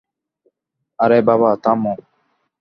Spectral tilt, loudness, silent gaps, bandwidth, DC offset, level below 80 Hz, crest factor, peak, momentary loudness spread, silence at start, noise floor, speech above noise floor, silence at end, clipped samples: -9.5 dB/octave; -16 LUFS; none; 6 kHz; under 0.1%; -62 dBFS; 18 dB; -2 dBFS; 10 LU; 1 s; -76 dBFS; 61 dB; 0.65 s; under 0.1%